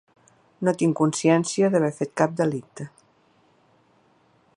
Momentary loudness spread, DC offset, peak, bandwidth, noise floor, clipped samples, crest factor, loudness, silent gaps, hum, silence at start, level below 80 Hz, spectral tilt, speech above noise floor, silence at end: 16 LU; under 0.1%; -4 dBFS; 11 kHz; -61 dBFS; under 0.1%; 20 dB; -23 LUFS; none; none; 0.6 s; -72 dBFS; -6 dB/octave; 39 dB; 1.7 s